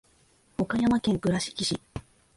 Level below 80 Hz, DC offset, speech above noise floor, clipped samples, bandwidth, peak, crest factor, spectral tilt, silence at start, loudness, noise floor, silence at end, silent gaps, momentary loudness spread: -52 dBFS; under 0.1%; 37 dB; under 0.1%; 11.5 kHz; -14 dBFS; 14 dB; -5 dB/octave; 0.6 s; -27 LUFS; -63 dBFS; 0.35 s; none; 16 LU